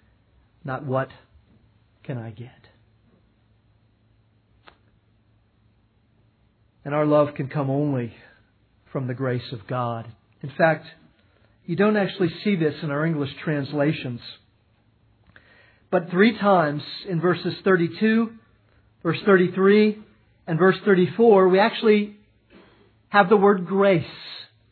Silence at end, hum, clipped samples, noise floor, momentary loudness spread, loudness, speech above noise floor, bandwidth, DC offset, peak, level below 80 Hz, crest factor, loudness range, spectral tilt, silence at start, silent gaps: 0.25 s; none; under 0.1%; -62 dBFS; 17 LU; -21 LUFS; 41 dB; 4.6 kHz; under 0.1%; -2 dBFS; -66 dBFS; 22 dB; 15 LU; -10.5 dB/octave; 0.65 s; none